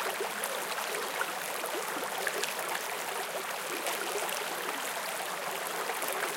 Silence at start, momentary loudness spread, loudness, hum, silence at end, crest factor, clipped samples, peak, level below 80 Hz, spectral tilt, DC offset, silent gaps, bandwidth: 0 s; 2 LU; -33 LUFS; none; 0 s; 26 dB; under 0.1%; -10 dBFS; -88 dBFS; -0.5 dB/octave; under 0.1%; none; 17 kHz